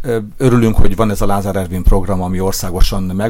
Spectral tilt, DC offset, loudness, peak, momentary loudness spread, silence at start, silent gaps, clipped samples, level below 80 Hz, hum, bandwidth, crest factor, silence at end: -6.5 dB/octave; under 0.1%; -16 LUFS; 0 dBFS; 6 LU; 0 s; none; under 0.1%; -16 dBFS; none; 16.5 kHz; 12 dB; 0 s